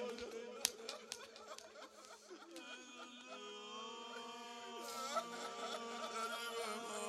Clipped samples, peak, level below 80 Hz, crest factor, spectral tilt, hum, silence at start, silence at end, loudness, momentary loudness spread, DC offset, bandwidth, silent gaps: under 0.1%; -10 dBFS; -86 dBFS; 38 dB; -0.5 dB/octave; none; 0 s; 0 s; -47 LUFS; 13 LU; under 0.1%; 16 kHz; none